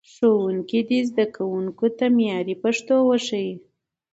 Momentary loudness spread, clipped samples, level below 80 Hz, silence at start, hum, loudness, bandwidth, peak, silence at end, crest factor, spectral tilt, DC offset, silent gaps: 7 LU; under 0.1%; -70 dBFS; 0.2 s; none; -22 LUFS; 8 kHz; -8 dBFS; 0.55 s; 14 dB; -5.5 dB/octave; under 0.1%; none